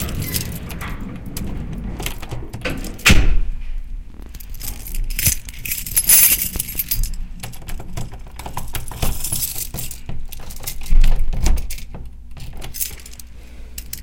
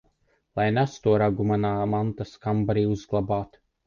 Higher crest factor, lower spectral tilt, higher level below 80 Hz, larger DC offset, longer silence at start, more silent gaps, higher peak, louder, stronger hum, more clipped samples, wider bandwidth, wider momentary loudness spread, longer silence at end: about the same, 18 dB vs 16 dB; second, -2.5 dB/octave vs -8 dB/octave; first, -22 dBFS vs -50 dBFS; first, 1% vs under 0.1%; second, 0 s vs 0.55 s; neither; first, 0 dBFS vs -10 dBFS; first, -20 LUFS vs -25 LUFS; neither; neither; first, 17.5 kHz vs 7.2 kHz; first, 22 LU vs 8 LU; second, 0 s vs 0.4 s